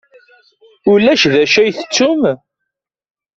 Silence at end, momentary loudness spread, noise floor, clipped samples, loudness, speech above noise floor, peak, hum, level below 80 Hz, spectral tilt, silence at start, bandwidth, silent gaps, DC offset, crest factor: 1 s; 8 LU; -77 dBFS; under 0.1%; -12 LUFS; 65 dB; 0 dBFS; none; -54 dBFS; -4 dB/octave; 0.85 s; 7.8 kHz; none; under 0.1%; 14 dB